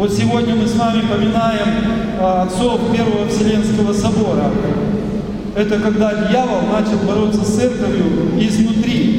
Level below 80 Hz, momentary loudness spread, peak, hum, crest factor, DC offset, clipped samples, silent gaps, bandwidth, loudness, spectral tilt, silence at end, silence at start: -34 dBFS; 3 LU; -2 dBFS; none; 14 dB; under 0.1%; under 0.1%; none; 11.5 kHz; -16 LUFS; -6.5 dB/octave; 0 s; 0 s